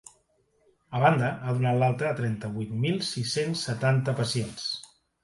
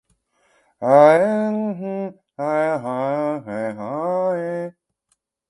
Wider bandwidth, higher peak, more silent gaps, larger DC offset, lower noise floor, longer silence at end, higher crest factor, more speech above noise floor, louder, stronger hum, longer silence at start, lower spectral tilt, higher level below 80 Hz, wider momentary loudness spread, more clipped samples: about the same, 11.5 kHz vs 11 kHz; second, -6 dBFS vs 0 dBFS; neither; neither; about the same, -68 dBFS vs -70 dBFS; second, 0.4 s vs 0.8 s; about the same, 22 dB vs 20 dB; second, 42 dB vs 54 dB; second, -27 LUFS vs -20 LUFS; neither; about the same, 0.9 s vs 0.8 s; second, -5.5 dB/octave vs -7.5 dB/octave; first, -62 dBFS vs -70 dBFS; second, 9 LU vs 15 LU; neither